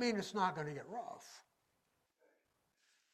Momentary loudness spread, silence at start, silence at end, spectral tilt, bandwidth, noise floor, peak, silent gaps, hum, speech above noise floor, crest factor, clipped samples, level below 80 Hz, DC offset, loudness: 20 LU; 0 s; 1.75 s; -4.5 dB/octave; 15.5 kHz; -82 dBFS; -22 dBFS; none; none; 42 dB; 22 dB; under 0.1%; -84 dBFS; under 0.1%; -41 LUFS